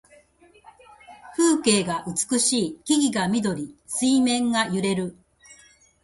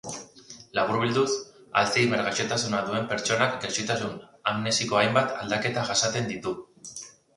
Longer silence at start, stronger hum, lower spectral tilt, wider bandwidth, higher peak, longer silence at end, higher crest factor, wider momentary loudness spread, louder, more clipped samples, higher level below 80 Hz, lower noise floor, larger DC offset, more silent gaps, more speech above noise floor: first, 1.1 s vs 0.05 s; neither; about the same, -3.5 dB/octave vs -3.5 dB/octave; about the same, 11.5 kHz vs 11.5 kHz; about the same, -6 dBFS vs -4 dBFS; first, 0.5 s vs 0.25 s; about the same, 18 dB vs 22 dB; second, 9 LU vs 16 LU; first, -22 LUFS vs -26 LUFS; neither; about the same, -60 dBFS vs -62 dBFS; first, -55 dBFS vs -49 dBFS; neither; neither; first, 33 dB vs 23 dB